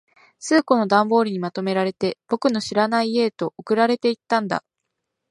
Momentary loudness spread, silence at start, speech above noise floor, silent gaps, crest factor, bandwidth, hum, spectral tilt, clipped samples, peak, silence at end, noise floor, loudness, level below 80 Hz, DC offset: 9 LU; 0.4 s; 59 dB; none; 20 dB; 11.5 kHz; none; -5 dB/octave; under 0.1%; -2 dBFS; 0.7 s; -79 dBFS; -21 LUFS; -68 dBFS; under 0.1%